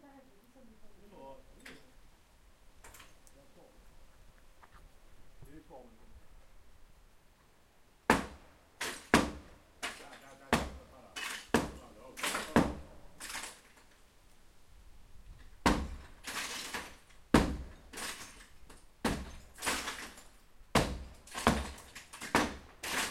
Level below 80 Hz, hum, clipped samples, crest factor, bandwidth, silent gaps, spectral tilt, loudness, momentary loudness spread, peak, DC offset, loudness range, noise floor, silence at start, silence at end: -50 dBFS; none; under 0.1%; 34 dB; 16.5 kHz; none; -4 dB/octave; -35 LUFS; 25 LU; -6 dBFS; under 0.1%; 6 LU; -64 dBFS; 0.05 s; 0 s